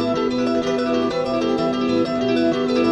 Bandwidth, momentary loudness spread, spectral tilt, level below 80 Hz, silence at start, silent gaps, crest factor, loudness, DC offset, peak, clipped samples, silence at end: 8.8 kHz; 2 LU; -6 dB/octave; -50 dBFS; 0 s; none; 12 dB; -20 LUFS; under 0.1%; -8 dBFS; under 0.1%; 0 s